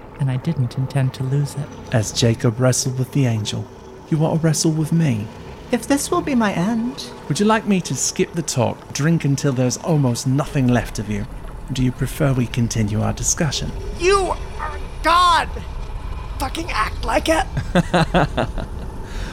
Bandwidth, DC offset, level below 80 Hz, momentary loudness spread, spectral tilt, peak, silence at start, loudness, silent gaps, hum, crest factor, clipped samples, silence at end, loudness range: 16 kHz; under 0.1%; -32 dBFS; 13 LU; -5 dB/octave; -4 dBFS; 0 s; -20 LUFS; none; none; 16 dB; under 0.1%; 0 s; 2 LU